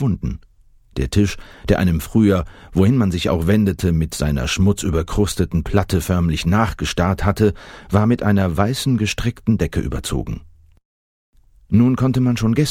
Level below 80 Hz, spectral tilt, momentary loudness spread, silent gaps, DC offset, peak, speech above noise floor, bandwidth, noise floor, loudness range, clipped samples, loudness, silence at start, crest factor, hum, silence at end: -32 dBFS; -6.5 dB/octave; 8 LU; 10.85-11.33 s; under 0.1%; 0 dBFS; 33 dB; 16.5 kHz; -50 dBFS; 3 LU; under 0.1%; -18 LUFS; 0 s; 18 dB; none; 0 s